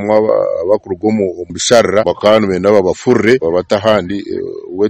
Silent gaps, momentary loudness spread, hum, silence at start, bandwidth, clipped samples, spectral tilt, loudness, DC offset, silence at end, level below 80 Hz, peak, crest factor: none; 9 LU; none; 0 s; 12 kHz; 0.8%; -4.5 dB/octave; -13 LUFS; under 0.1%; 0 s; -46 dBFS; 0 dBFS; 12 dB